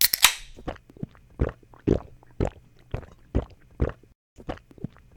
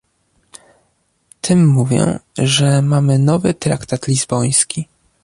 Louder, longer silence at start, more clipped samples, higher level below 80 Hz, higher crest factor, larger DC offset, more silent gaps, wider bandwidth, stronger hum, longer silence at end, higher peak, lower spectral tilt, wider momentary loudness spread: second, -27 LUFS vs -15 LUFS; second, 0 s vs 1.45 s; neither; first, -38 dBFS vs -48 dBFS; first, 28 dB vs 16 dB; neither; first, 4.15-4.36 s vs none; first, 19.5 kHz vs 11.5 kHz; neither; about the same, 0.3 s vs 0.4 s; about the same, 0 dBFS vs 0 dBFS; second, -3 dB/octave vs -5 dB/octave; first, 20 LU vs 7 LU